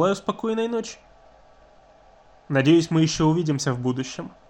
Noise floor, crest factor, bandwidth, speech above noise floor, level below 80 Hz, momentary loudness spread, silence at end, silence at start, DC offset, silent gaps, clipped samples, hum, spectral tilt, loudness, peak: -53 dBFS; 18 dB; 9.4 kHz; 31 dB; -54 dBFS; 11 LU; 0.2 s; 0 s; under 0.1%; none; under 0.1%; none; -6 dB/octave; -23 LUFS; -6 dBFS